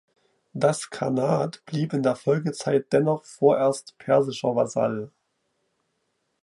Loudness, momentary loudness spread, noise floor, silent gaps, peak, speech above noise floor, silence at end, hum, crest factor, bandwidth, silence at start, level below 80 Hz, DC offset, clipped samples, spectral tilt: -24 LUFS; 8 LU; -75 dBFS; none; -6 dBFS; 51 dB; 1.35 s; none; 20 dB; 11.5 kHz; 0.55 s; -70 dBFS; under 0.1%; under 0.1%; -6 dB/octave